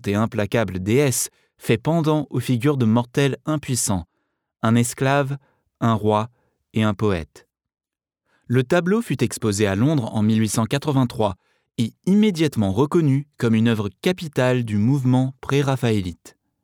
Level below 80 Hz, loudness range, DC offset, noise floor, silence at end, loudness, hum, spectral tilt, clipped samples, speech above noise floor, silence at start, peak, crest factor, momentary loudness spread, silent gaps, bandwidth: -52 dBFS; 3 LU; under 0.1%; -78 dBFS; 0.35 s; -21 LUFS; none; -6 dB/octave; under 0.1%; 58 dB; 0.05 s; -4 dBFS; 16 dB; 7 LU; none; 18.5 kHz